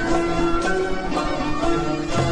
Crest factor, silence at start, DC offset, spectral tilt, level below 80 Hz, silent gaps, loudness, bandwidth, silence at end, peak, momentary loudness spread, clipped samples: 14 dB; 0 s; under 0.1%; -5.5 dB/octave; -32 dBFS; none; -23 LUFS; 10.5 kHz; 0 s; -8 dBFS; 3 LU; under 0.1%